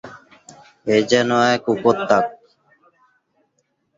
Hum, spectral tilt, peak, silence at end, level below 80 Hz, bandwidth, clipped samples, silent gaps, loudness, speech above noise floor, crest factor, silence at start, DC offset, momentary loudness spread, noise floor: none; -4.5 dB/octave; -2 dBFS; 1.65 s; -62 dBFS; 7.8 kHz; under 0.1%; none; -18 LUFS; 52 dB; 20 dB; 0.05 s; under 0.1%; 12 LU; -69 dBFS